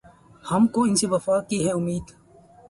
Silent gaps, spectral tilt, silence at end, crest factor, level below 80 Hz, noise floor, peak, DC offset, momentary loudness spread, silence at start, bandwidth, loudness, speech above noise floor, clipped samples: none; -5 dB/octave; 0.6 s; 16 dB; -54 dBFS; -52 dBFS; -8 dBFS; under 0.1%; 10 LU; 0.45 s; 11.5 kHz; -23 LUFS; 29 dB; under 0.1%